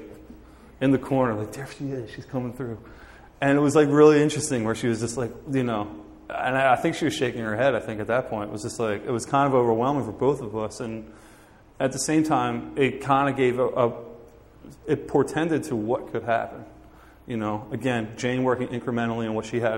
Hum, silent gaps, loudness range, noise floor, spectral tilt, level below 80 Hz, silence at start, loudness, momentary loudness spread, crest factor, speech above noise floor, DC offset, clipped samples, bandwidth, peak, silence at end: none; none; 6 LU; -51 dBFS; -5.5 dB/octave; -54 dBFS; 0 s; -24 LUFS; 13 LU; 20 dB; 27 dB; under 0.1%; under 0.1%; 16 kHz; -4 dBFS; 0 s